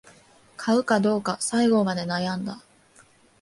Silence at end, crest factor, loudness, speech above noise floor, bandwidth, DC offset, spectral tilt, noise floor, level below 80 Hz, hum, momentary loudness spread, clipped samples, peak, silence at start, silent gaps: 0.85 s; 18 dB; -24 LUFS; 33 dB; 11.5 kHz; under 0.1%; -5 dB/octave; -56 dBFS; -64 dBFS; none; 11 LU; under 0.1%; -8 dBFS; 0.6 s; none